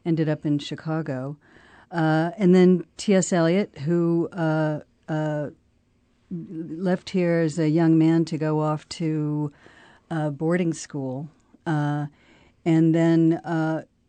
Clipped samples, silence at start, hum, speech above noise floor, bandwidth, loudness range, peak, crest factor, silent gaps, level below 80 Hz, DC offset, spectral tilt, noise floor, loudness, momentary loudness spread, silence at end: under 0.1%; 0.05 s; none; 42 dB; 9 kHz; 6 LU; -8 dBFS; 16 dB; none; -66 dBFS; under 0.1%; -7 dB/octave; -64 dBFS; -23 LUFS; 15 LU; 0.25 s